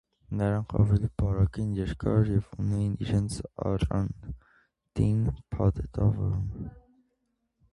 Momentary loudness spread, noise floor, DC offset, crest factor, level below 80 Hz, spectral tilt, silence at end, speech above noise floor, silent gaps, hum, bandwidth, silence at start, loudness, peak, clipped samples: 11 LU; -77 dBFS; under 0.1%; 18 dB; -40 dBFS; -8.5 dB/octave; 0.95 s; 50 dB; none; none; 11.5 kHz; 0.3 s; -29 LUFS; -10 dBFS; under 0.1%